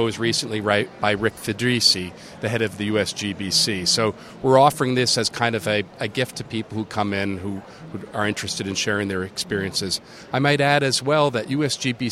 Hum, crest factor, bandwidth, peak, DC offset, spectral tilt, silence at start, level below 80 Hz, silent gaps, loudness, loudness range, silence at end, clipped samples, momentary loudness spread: none; 20 dB; 16 kHz; -2 dBFS; under 0.1%; -3.5 dB/octave; 0 s; -56 dBFS; none; -21 LUFS; 6 LU; 0 s; under 0.1%; 11 LU